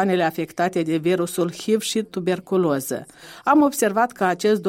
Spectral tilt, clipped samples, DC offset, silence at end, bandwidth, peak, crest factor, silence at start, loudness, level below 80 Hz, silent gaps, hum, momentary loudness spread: -5 dB/octave; under 0.1%; under 0.1%; 0 s; 16.5 kHz; -4 dBFS; 16 dB; 0 s; -21 LUFS; -64 dBFS; none; none; 8 LU